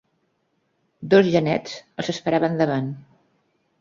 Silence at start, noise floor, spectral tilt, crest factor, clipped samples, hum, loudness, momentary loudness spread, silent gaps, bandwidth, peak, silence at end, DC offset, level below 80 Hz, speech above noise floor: 1 s; -70 dBFS; -6.5 dB/octave; 20 dB; under 0.1%; none; -21 LUFS; 17 LU; none; 7.6 kHz; -2 dBFS; 0.8 s; under 0.1%; -62 dBFS; 49 dB